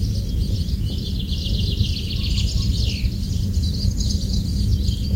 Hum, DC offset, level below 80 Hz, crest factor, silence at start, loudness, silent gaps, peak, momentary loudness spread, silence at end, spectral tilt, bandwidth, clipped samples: none; under 0.1%; -24 dBFS; 14 dB; 0 s; -23 LUFS; none; -6 dBFS; 3 LU; 0 s; -5.5 dB/octave; 16 kHz; under 0.1%